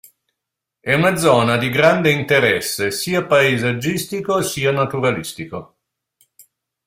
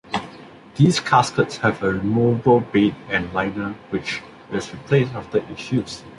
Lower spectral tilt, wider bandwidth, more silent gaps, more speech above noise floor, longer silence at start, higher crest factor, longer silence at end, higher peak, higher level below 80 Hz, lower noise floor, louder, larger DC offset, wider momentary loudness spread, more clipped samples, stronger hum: second, -4.5 dB/octave vs -6 dB/octave; first, 16.5 kHz vs 11.5 kHz; neither; first, 64 dB vs 22 dB; first, 0.85 s vs 0.05 s; about the same, 18 dB vs 18 dB; first, 1.2 s vs 0.05 s; about the same, -2 dBFS vs -2 dBFS; about the same, -54 dBFS vs -50 dBFS; first, -82 dBFS vs -42 dBFS; first, -17 LUFS vs -21 LUFS; neither; about the same, 11 LU vs 12 LU; neither; neither